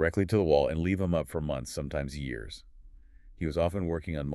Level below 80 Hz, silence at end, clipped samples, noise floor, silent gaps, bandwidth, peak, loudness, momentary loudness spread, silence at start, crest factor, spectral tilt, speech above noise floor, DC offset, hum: -44 dBFS; 0 s; under 0.1%; -52 dBFS; none; 13 kHz; -10 dBFS; -30 LUFS; 12 LU; 0 s; 20 dB; -7 dB/octave; 23 dB; under 0.1%; none